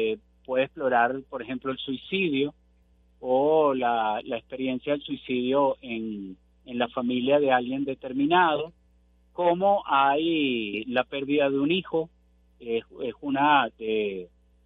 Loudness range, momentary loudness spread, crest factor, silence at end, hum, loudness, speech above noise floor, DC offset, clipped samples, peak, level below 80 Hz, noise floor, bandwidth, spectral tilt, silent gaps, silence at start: 3 LU; 13 LU; 18 dB; 0.4 s; 60 Hz at -55 dBFS; -26 LUFS; 36 dB; under 0.1%; under 0.1%; -8 dBFS; -62 dBFS; -61 dBFS; 4.1 kHz; -8.5 dB/octave; none; 0 s